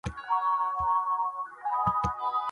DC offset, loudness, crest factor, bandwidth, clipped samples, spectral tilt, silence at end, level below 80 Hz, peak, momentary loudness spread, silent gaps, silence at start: under 0.1%; -29 LUFS; 14 dB; 11 kHz; under 0.1%; -5.5 dB/octave; 0 s; -50 dBFS; -14 dBFS; 5 LU; none; 0.05 s